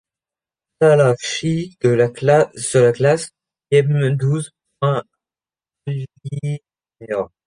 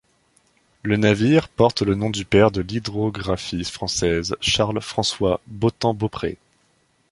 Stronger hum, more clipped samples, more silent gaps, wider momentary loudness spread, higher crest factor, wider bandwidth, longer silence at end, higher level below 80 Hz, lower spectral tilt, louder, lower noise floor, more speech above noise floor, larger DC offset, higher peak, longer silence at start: neither; neither; neither; first, 13 LU vs 9 LU; about the same, 18 dB vs 20 dB; about the same, 10.5 kHz vs 11.5 kHz; second, 0.2 s vs 0.75 s; second, -58 dBFS vs -44 dBFS; about the same, -6 dB/octave vs -5 dB/octave; first, -18 LUFS vs -21 LUFS; first, under -90 dBFS vs -63 dBFS; first, over 73 dB vs 43 dB; neither; about the same, -2 dBFS vs -2 dBFS; about the same, 0.8 s vs 0.85 s